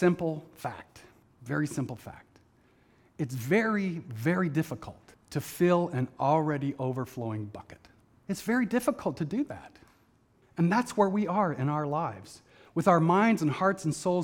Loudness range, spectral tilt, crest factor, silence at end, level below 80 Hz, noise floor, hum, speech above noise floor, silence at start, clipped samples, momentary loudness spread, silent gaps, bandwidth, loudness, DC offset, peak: 6 LU; -7 dB/octave; 22 dB; 0 s; -66 dBFS; -65 dBFS; none; 36 dB; 0 s; under 0.1%; 15 LU; none; 18.5 kHz; -29 LUFS; under 0.1%; -8 dBFS